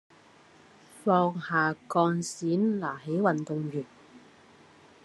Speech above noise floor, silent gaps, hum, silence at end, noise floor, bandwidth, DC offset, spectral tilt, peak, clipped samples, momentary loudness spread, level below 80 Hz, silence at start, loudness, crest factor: 29 dB; none; none; 0.85 s; -57 dBFS; 12 kHz; under 0.1%; -6 dB/octave; -10 dBFS; under 0.1%; 8 LU; -78 dBFS; 0.95 s; -28 LUFS; 18 dB